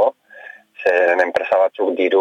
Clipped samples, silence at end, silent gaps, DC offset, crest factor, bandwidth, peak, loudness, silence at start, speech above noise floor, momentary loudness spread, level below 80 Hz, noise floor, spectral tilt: under 0.1%; 0 s; none; under 0.1%; 14 dB; 8.4 kHz; -4 dBFS; -17 LUFS; 0 s; 24 dB; 23 LU; -68 dBFS; -41 dBFS; -4 dB/octave